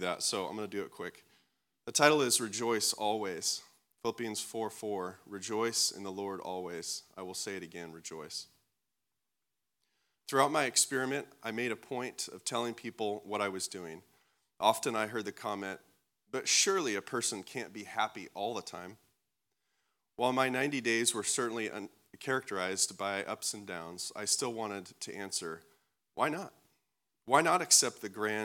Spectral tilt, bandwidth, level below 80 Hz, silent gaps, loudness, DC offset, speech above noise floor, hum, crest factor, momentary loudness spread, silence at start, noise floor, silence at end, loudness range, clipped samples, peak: -2 dB/octave; 18 kHz; -86 dBFS; none; -33 LUFS; under 0.1%; 55 dB; none; 28 dB; 16 LU; 0 s; -89 dBFS; 0 s; 6 LU; under 0.1%; -8 dBFS